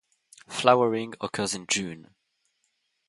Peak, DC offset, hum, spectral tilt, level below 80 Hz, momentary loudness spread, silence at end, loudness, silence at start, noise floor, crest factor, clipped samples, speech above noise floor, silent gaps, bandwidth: -2 dBFS; under 0.1%; none; -3.5 dB/octave; -68 dBFS; 16 LU; 1.1 s; -25 LUFS; 0.5 s; -75 dBFS; 26 dB; under 0.1%; 50 dB; none; 11.5 kHz